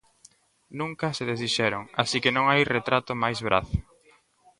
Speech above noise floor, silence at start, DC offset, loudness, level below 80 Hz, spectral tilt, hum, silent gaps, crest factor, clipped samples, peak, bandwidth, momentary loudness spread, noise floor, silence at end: 35 dB; 0.7 s; under 0.1%; -25 LUFS; -46 dBFS; -4.5 dB/octave; none; none; 24 dB; under 0.1%; -4 dBFS; 11.5 kHz; 12 LU; -61 dBFS; 0.8 s